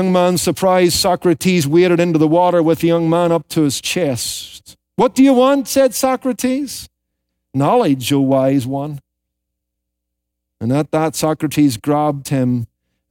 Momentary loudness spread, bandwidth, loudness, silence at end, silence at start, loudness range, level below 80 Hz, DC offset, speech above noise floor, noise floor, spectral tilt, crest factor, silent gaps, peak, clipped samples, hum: 10 LU; 17 kHz; -15 LUFS; 0.45 s; 0 s; 6 LU; -52 dBFS; under 0.1%; 62 dB; -77 dBFS; -5.5 dB/octave; 12 dB; none; -2 dBFS; under 0.1%; none